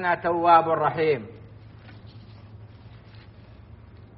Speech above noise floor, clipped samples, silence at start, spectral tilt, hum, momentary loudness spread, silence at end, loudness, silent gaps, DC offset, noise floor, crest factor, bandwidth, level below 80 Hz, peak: 26 dB; under 0.1%; 0 s; -4 dB/octave; none; 28 LU; 0.15 s; -21 LUFS; none; under 0.1%; -47 dBFS; 22 dB; 5.6 kHz; -56 dBFS; -4 dBFS